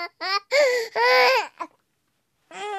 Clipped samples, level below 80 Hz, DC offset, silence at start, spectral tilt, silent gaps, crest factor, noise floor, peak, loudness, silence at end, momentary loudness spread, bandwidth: under 0.1%; -86 dBFS; under 0.1%; 0 s; 0.5 dB/octave; none; 16 dB; -73 dBFS; -6 dBFS; -20 LUFS; 0 s; 20 LU; 14 kHz